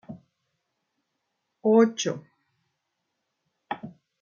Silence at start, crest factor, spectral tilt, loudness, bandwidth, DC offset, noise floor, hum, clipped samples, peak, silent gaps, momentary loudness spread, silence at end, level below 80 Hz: 0.1 s; 22 dB; -5 dB/octave; -23 LUFS; 7.4 kHz; under 0.1%; -80 dBFS; none; under 0.1%; -8 dBFS; none; 18 LU; 0.3 s; -80 dBFS